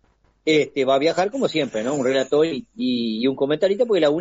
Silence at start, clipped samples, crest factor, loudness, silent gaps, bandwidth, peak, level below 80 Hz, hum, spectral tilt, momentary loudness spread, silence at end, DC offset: 0.45 s; under 0.1%; 14 dB; -21 LUFS; none; 8 kHz; -6 dBFS; -62 dBFS; none; -3.5 dB/octave; 5 LU; 0 s; under 0.1%